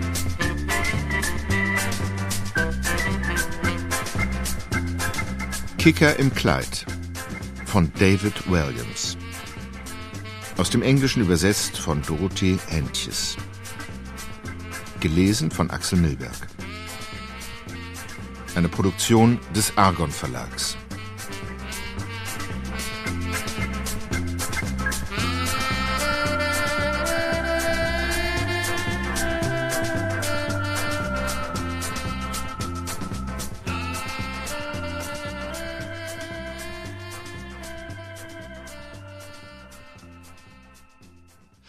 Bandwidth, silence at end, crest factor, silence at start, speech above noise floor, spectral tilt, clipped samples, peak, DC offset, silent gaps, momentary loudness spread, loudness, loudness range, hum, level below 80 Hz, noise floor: 15.5 kHz; 0.5 s; 24 dB; 0 s; 32 dB; -4.5 dB/octave; under 0.1%; 0 dBFS; under 0.1%; none; 16 LU; -25 LUFS; 11 LU; none; -36 dBFS; -53 dBFS